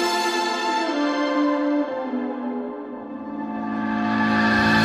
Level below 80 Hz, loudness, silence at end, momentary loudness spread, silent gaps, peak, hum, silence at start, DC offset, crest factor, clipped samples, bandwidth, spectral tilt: -54 dBFS; -23 LUFS; 0 s; 13 LU; none; -8 dBFS; none; 0 s; under 0.1%; 16 dB; under 0.1%; 15 kHz; -4.5 dB/octave